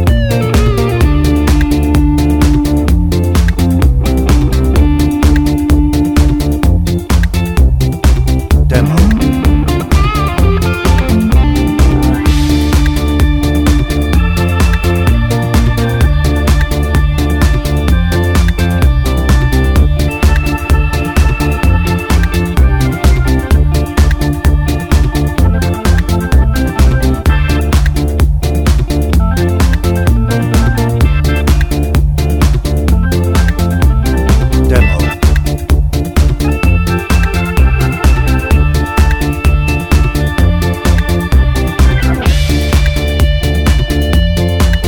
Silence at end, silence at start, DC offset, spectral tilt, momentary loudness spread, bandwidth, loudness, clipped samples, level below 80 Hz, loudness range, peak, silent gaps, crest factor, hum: 0 s; 0 s; under 0.1%; -6.5 dB/octave; 2 LU; 18 kHz; -11 LUFS; under 0.1%; -12 dBFS; 1 LU; 0 dBFS; none; 10 dB; none